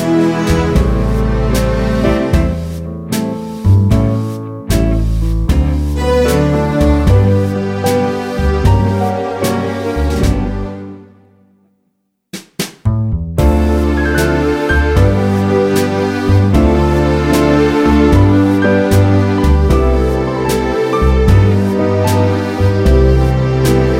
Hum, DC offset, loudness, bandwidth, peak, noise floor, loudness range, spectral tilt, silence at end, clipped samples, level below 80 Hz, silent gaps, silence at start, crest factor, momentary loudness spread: none; under 0.1%; -13 LUFS; 16.5 kHz; 0 dBFS; -65 dBFS; 7 LU; -7 dB/octave; 0 s; under 0.1%; -18 dBFS; none; 0 s; 12 dB; 8 LU